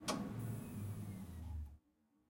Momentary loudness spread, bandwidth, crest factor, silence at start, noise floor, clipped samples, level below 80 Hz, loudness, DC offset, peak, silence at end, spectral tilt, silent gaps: 9 LU; 16.5 kHz; 20 dB; 0 s; -78 dBFS; under 0.1%; -58 dBFS; -47 LUFS; under 0.1%; -26 dBFS; 0.5 s; -5 dB/octave; none